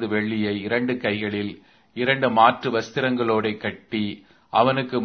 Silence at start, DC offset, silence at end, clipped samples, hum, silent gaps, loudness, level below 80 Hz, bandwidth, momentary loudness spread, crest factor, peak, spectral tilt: 0 s; under 0.1%; 0 s; under 0.1%; none; none; -22 LUFS; -62 dBFS; 6.6 kHz; 12 LU; 22 dB; -2 dBFS; -6.5 dB/octave